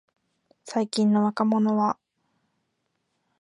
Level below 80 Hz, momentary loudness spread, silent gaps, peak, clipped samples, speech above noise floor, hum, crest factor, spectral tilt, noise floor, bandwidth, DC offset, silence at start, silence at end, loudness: -76 dBFS; 8 LU; none; -8 dBFS; under 0.1%; 54 dB; none; 18 dB; -6.5 dB/octave; -76 dBFS; 10.5 kHz; under 0.1%; 0.65 s; 1.5 s; -24 LUFS